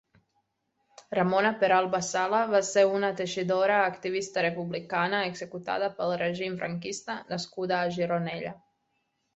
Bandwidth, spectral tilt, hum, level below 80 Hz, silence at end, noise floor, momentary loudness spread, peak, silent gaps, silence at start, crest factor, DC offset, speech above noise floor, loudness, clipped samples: 8.2 kHz; -4.5 dB/octave; none; -72 dBFS; 0.8 s; -77 dBFS; 11 LU; -10 dBFS; none; 1.1 s; 20 dB; under 0.1%; 49 dB; -28 LUFS; under 0.1%